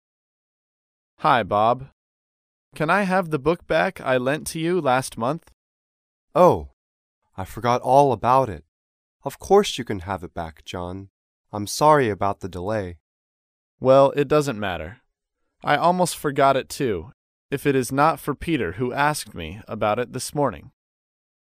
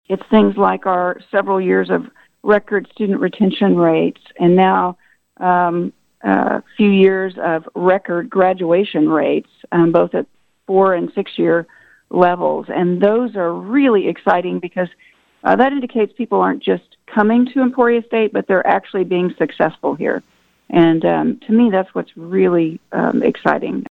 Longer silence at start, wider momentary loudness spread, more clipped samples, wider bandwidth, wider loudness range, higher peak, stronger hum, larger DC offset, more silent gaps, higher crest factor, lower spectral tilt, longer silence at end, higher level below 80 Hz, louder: first, 1.2 s vs 0.1 s; first, 16 LU vs 8 LU; neither; first, 15.5 kHz vs 4.7 kHz; about the same, 3 LU vs 2 LU; about the same, -2 dBFS vs 0 dBFS; neither; neither; first, 1.93-2.72 s, 5.53-6.28 s, 6.73-7.22 s, 8.68-9.20 s, 11.10-11.45 s, 13.00-13.78 s, 17.14-17.49 s vs none; about the same, 20 dB vs 16 dB; second, -5 dB/octave vs -9 dB/octave; first, 0.8 s vs 0.1 s; first, -50 dBFS vs -58 dBFS; second, -21 LUFS vs -16 LUFS